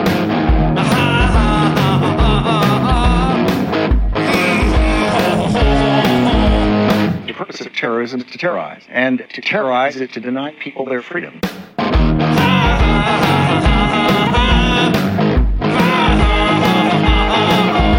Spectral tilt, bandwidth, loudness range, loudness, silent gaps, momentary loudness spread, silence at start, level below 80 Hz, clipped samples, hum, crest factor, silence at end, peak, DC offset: -6 dB/octave; 16.5 kHz; 6 LU; -14 LUFS; none; 9 LU; 0 s; -20 dBFS; under 0.1%; none; 14 dB; 0 s; 0 dBFS; under 0.1%